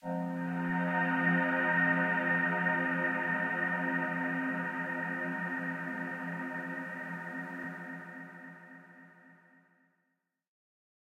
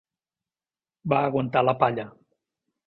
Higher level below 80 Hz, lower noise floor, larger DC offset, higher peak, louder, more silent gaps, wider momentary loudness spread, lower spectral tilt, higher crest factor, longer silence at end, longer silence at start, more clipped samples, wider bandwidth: second, -84 dBFS vs -64 dBFS; second, -82 dBFS vs under -90 dBFS; neither; second, -18 dBFS vs -4 dBFS; second, -32 LUFS vs -24 LUFS; neither; about the same, 16 LU vs 14 LU; second, -7.5 dB/octave vs -10 dB/octave; second, 16 dB vs 24 dB; first, 1.85 s vs 0.75 s; second, 0.05 s vs 1.05 s; neither; first, 9.2 kHz vs 5.4 kHz